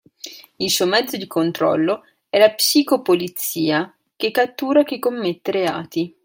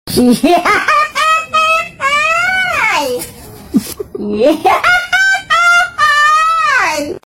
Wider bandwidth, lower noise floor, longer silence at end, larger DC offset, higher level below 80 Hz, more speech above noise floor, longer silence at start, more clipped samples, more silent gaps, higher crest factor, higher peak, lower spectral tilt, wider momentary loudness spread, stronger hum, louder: about the same, 17 kHz vs 16.5 kHz; first, -40 dBFS vs -32 dBFS; about the same, 0.15 s vs 0.05 s; neither; second, -68 dBFS vs -42 dBFS; about the same, 21 dB vs 22 dB; first, 0.25 s vs 0.05 s; neither; neither; first, 18 dB vs 12 dB; about the same, -2 dBFS vs 0 dBFS; about the same, -3.5 dB/octave vs -3 dB/octave; about the same, 10 LU vs 9 LU; neither; second, -19 LUFS vs -11 LUFS